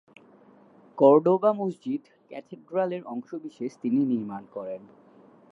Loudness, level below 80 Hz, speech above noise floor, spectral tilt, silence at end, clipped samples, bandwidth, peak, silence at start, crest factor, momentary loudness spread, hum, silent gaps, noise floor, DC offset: -26 LUFS; -80 dBFS; 30 dB; -9 dB/octave; 0.75 s; under 0.1%; 7.6 kHz; -6 dBFS; 0.95 s; 20 dB; 23 LU; none; none; -55 dBFS; under 0.1%